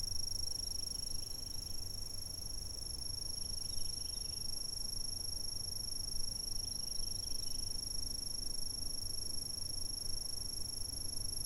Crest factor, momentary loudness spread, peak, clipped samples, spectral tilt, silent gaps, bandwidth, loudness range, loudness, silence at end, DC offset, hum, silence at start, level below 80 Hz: 14 dB; 4 LU; -24 dBFS; under 0.1%; -1.5 dB/octave; none; 17 kHz; 2 LU; -40 LUFS; 0 s; under 0.1%; none; 0 s; -48 dBFS